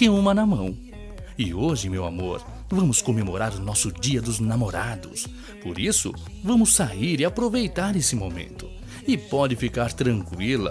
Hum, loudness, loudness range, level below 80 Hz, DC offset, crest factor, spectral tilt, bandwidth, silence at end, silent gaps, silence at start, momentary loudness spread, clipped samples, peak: none; -23 LUFS; 3 LU; -40 dBFS; under 0.1%; 20 dB; -4.5 dB/octave; 11 kHz; 0 s; none; 0 s; 15 LU; under 0.1%; -4 dBFS